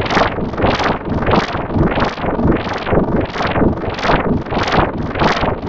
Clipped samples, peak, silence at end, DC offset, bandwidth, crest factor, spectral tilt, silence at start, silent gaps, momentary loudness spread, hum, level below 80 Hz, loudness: under 0.1%; -2 dBFS; 0 s; under 0.1%; 8 kHz; 14 dB; -6.5 dB/octave; 0 s; none; 3 LU; none; -26 dBFS; -16 LUFS